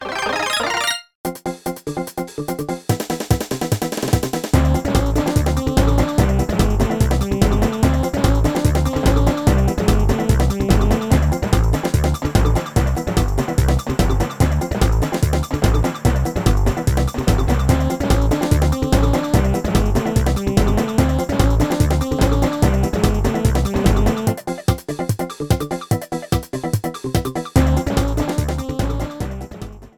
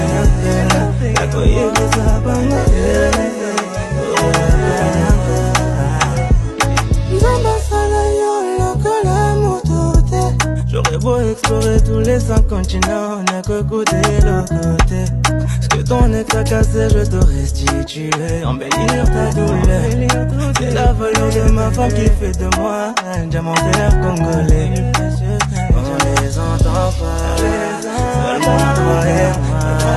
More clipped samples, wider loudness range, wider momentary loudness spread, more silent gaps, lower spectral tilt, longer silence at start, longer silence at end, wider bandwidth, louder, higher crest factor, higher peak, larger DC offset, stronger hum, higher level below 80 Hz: neither; first, 4 LU vs 1 LU; first, 7 LU vs 4 LU; first, 1.15-1.24 s vs none; about the same, -6 dB/octave vs -5.5 dB/octave; about the same, 0 s vs 0 s; about the same, 0.1 s vs 0 s; first, 19.5 kHz vs 13 kHz; second, -19 LUFS vs -15 LUFS; about the same, 16 dB vs 14 dB; about the same, 0 dBFS vs 0 dBFS; first, 0.2% vs under 0.1%; neither; about the same, -22 dBFS vs -18 dBFS